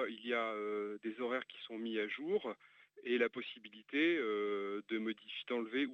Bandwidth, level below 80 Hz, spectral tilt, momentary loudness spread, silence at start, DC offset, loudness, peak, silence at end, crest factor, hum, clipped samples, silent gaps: 6.8 kHz; under -90 dBFS; -6 dB/octave; 12 LU; 0 s; under 0.1%; -39 LUFS; -20 dBFS; 0 s; 18 dB; none; under 0.1%; none